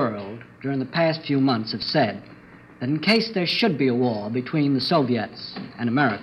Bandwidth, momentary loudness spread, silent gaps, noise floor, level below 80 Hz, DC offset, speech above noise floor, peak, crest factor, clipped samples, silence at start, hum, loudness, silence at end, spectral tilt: 11.5 kHz; 12 LU; none; -46 dBFS; -64 dBFS; under 0.1%; 24 dB; -6 dBFS; 18 dB; under 0.1%; 0 s; none; -23 LUFS; 0 s; -7 dB/octave